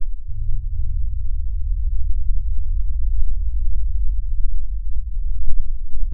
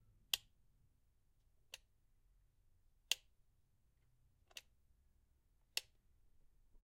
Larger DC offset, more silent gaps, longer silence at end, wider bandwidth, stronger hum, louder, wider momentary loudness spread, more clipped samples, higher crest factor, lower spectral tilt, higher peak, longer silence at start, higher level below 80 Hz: neither; neither; second, 0 s vs 1.2 s; second, 0.2 kHz vs 13.5 kHz; neither; first, -28 LUFS vs -44 LUFS; second, 4 LU vs 16 LU; neither; second, 14 dB vs 38 dB; first, -14 dB/octave vs 2 dB/octave; first, 0 dBFS vs -16 dBFS; second, 0 s vs 0.35 s; first, -20 dBFS vs -76 dBFS